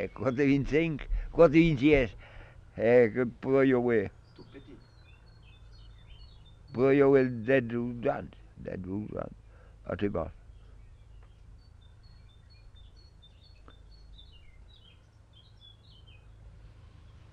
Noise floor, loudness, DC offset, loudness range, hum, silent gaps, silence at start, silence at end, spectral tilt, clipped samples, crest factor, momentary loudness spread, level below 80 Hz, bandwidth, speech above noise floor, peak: -57 dBFS; -27 LUFS; under 0.1%; 15 LU; none; none; 0 s; 0.65 s; -8.5 dB/octave; under 0.1%; 20 dB; 19 LU; -46 dBFS; 7.4 kHz; 31 dB; -10 dBFS